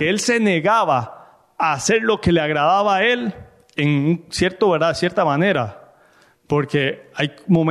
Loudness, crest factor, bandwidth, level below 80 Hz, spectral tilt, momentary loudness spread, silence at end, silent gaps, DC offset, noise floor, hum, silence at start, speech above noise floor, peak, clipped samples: -18 LUFS; 14 dB; 13 kHz; -48 dBFS; -5 dB/octave; 8 LU; 0 s; none; under 0.1%; -54 dBFS; none; 0 s; 36 dB; -6 dBFS; under 0.1%